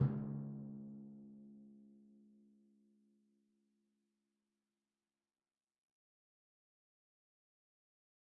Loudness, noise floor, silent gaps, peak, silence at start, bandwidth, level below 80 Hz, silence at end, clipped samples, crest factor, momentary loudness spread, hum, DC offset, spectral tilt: -47 LUFS; under -90 dBFS; none; -24 dBFS; 0 s; 2.1 kHz; -80 dBFS; 6.05 s; under 0.1%; 26 dB; 23 LU; none; under 0.1%; -11.5 dB/octave